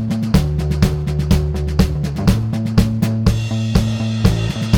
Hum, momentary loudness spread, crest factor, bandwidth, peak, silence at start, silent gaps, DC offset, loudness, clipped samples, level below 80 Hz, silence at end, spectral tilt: none; 3 LU; 14 dB; 19 kHz; -2 dBFS; 0 s; none; 0.1%; -17 LUFS; under 0.1%; -24 dBFS; 0 s; -7 dB/octave